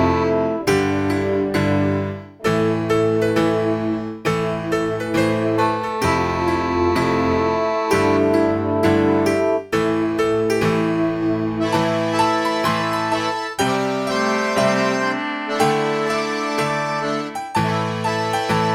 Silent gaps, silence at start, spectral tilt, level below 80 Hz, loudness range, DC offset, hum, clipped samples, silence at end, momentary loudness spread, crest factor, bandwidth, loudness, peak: none; 0 s; -5.5 dB/octave; -46 dBFS; 2 LU; under 0.1%; none; under 0.1%; 0 s; 4 LU; 16 dB; 16.5 kHz; -19 LUFS; -4 dBFS